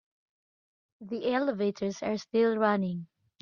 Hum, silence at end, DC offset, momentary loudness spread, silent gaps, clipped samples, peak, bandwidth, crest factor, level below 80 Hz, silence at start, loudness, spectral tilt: none; 0.35 s; under 0.1%; 9 LU; none; under 0.1%; -12 dBFS; 7.2 kHz; 18 dB; -74 dBFS; 1 s; -29 LUFS; -6.5 dB/octave